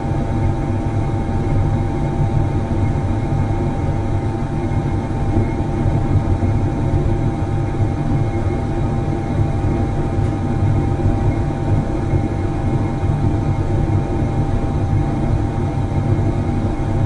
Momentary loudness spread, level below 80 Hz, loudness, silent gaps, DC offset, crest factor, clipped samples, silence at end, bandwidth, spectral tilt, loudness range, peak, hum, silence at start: 3 LU; -24 dBFS; -19 LUFS; none; under 0.1%; 14 dB; under 0.1%; 0 s; 10 kHz; -9 dB/octave; 1 LU; -4 dBFS; none; 0 s